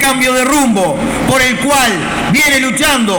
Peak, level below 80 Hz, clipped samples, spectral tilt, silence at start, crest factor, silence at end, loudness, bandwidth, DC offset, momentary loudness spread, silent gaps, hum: 0 dBFS; -34 dBFS; under 0.1%; -3 dB/octave; 0 s; 10 dB; 0 s; -10 LUFS; 19.5 kHz; under 0.1%; 4 LU; none; none